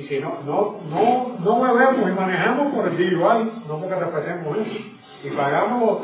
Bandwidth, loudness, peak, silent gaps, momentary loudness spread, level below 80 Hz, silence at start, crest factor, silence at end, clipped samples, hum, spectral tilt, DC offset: 4 kHz; -21 LUFS; -4 dBFS; none; 11 LU; -70 dBFS; 0 s; 18 dB; 0 s; under 0.1%; none; -10.5 dB/octave; under 0.1%